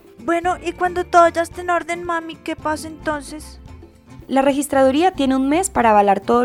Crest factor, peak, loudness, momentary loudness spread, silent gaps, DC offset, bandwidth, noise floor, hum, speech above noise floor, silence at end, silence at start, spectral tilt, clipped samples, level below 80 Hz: 18 dB; 0 dBFS; -18 LUFS; 12 LU; none; under 0.1%; 16 kHz; -41 dBFS; none; 24 dB; 0 s; 0.2 s; -4.5 dB/octave; under 0.1%; -44 dBFS